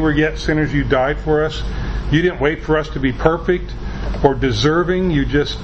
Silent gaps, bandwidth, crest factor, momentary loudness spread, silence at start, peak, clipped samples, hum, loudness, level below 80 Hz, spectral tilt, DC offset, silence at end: none; 8.2 kHz; 16 dB; 8 LU; 0 s; 0 dBFS; under 0.1%; none; -18 LUFS; -26 dBFS; -6.5 dB/octave; under 0.1%; 0 s